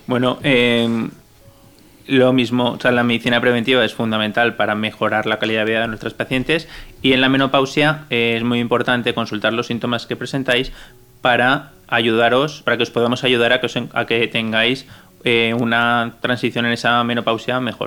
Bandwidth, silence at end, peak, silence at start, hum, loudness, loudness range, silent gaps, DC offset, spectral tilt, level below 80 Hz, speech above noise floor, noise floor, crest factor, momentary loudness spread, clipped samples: 19 kHz; 0 s; -2 dBFS; 0.1 s; none; -17 LUFS; 2 LU; none; under 0.1%; -5.5 dB/octave; -48 dBFS; 30 dB; -47 dBFS; 16 dB; 7 LU; under 0.1%